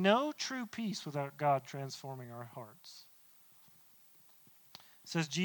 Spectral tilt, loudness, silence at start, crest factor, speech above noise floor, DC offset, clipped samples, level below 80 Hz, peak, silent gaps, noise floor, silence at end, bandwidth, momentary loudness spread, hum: -4.5 dB/octave; -37 LUFS; 0 s; 26 dB; 26 dB; under 0.1%; under 0.1%; -86 dBFS; -12 dBFS; none; -63 dBFS; 0 s; 19 kHz; 26 LU; none